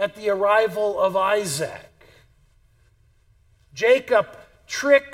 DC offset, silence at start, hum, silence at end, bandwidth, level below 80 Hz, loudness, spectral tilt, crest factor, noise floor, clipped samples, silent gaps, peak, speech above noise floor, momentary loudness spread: under 0.1%; 0 s; none; 0 s; 16.5 kHz; -60 dBFS; -21 LUFS; -3.5 dB/octave; 18 dB; -59 dBFS; under 0.1%; none; -4 dBFS; 38 dB; 13 LU